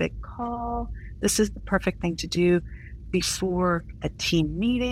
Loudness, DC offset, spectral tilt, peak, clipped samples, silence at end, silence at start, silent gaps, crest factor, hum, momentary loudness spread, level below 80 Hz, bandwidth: -26 LUFS; under 0.1%; -4.5 dB/octave; -8 dBFS; under 0.1%; 0 s; 0 s; none; 18 dB; none; 10 LU; -40 dBFS; 16 kHz